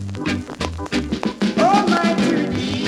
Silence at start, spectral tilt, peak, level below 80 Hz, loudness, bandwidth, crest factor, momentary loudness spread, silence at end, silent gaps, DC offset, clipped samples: 0 s; -5.5 dB/octave; -4 dBFS; -40 dBFS; -19 LUFS; 12.5 kHz; 16 dB; 9 LU; 0 s; none; under 0.1%; under 0.1%